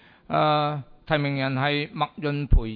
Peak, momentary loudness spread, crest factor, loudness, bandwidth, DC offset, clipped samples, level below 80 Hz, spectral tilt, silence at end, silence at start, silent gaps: -4 dBFS; 7 LU; 20 dB; -25 LUFS; 4.9 kHz; under 0.1%; under 0.1%; -30 dBFS; -9.5 dB/octave; 0 s; 0.3 s; none